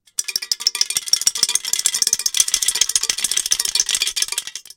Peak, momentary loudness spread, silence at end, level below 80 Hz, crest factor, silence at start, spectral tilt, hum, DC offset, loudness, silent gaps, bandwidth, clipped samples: 0 dBFS; 6 LU; 0.15 s; -56 dBFS; 20 dB; 0.2 s; 3.5 dB/octave; none; under 0.1%; -17 LUFS; none; 17.5 kHz; under 0.1%